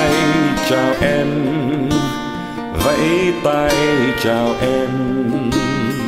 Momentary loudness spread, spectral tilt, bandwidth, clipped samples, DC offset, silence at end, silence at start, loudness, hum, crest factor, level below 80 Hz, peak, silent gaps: 4 LU; -5.5 dB/octave; 16 kHz; under 0.1%; under 0.1%; 0 s; 0 s; -17 LUFS; none; 14 dB; -36 dBFS; -4 dBFS; none